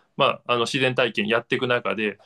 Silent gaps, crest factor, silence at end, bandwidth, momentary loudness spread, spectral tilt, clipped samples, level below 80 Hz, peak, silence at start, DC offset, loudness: none; 20 dB; 0.1 s; 12.5 kHz; 3 LU; -4.5 dB/octave; under 0.1%; -68 dBFS; -4 dBFS; 0.2 s; under 0.1%; -22 LUFS